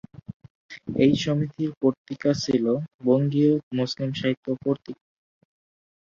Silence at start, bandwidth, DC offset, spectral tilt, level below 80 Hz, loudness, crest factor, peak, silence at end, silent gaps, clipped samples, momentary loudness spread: 0.3 s; 7.4 kHz; under 0.1%; -7 dB/octave; -60 dBFS; -24 LUFS; 18 dB; -6 dBFS; 1.2 s; 0.34-0.40 s, 0.50-0.69 s, 1.77-1.81 s, 1.98-2.05 s, 2.94-2.99 s, 3.63-3.71 s, 4.37-4.43 s; under 0.1%; 21 LU